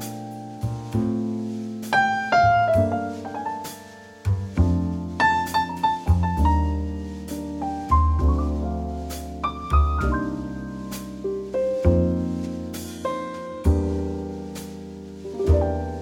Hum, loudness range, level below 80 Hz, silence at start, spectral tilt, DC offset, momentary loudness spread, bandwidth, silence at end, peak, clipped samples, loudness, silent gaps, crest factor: none; 4 LU; -30 dBFS; 0 s; -7 dB/octave; under 0.1%; 13 LU; 16.5 kHz; 0 s; -4 dBFS; under 0.1%; -24 LUFS; none; 18 dB